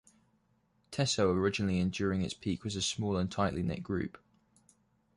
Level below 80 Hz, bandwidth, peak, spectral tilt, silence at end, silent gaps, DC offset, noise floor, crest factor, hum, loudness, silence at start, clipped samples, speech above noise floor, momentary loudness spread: -52 dBFS; 11.5 kHz; -16 dBFS; -5 dB/octave; 1 s; none; under 0.1%; -73 dBFS; 18 dB; none; -33 LUFS; 0.9 s; under 0.1%; 41 dB; 8 LU